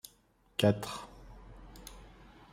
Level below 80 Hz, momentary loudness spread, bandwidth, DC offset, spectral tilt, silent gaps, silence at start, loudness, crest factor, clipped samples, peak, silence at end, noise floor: -56 dBFS; 25 LU; 16 kHz; under 0.1%; -5.5 dB/octave; none; 0.6 s; -33 LUFS; 24 dB; under 0.1%; -12 dBFS; 0.45 s; -67 dBFS